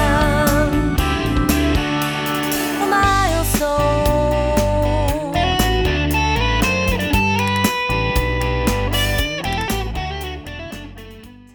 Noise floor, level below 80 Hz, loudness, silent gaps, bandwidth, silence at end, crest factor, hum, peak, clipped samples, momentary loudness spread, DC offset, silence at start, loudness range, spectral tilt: -39 dBFS; -24 dBFS; -18 LUFS; none; over 20 kHz; 0.2 s; 16 dB; none; -2 dBFS; under 0.1%; 9 LU; under 0.1%; 0 s; 3 LU; -5 dB/octave